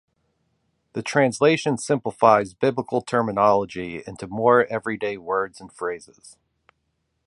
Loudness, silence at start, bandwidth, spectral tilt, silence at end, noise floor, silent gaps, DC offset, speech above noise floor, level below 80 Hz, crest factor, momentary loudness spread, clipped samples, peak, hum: -22 LUFS; 0.95 s; 11.5 kHz; -5.5 dB/octave; 1 s; -74 dBFS; none; under 0.1%; 52 dB; -60 dBFS; 22 dB; 14 LU; under 0.1%; -2 dBFS; none